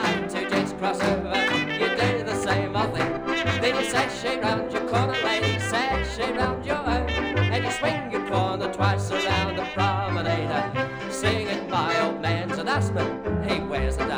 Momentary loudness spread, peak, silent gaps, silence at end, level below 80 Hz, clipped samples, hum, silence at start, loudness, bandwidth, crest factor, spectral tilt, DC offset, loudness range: 4 LU; -8 dBFS; none; 0 s; -40 dBFS; under 0.1%; none; 0 s; -25 LUFS; over 20 kHz; 16 dB; -5 dB/octave; under 0.1%; 1 LU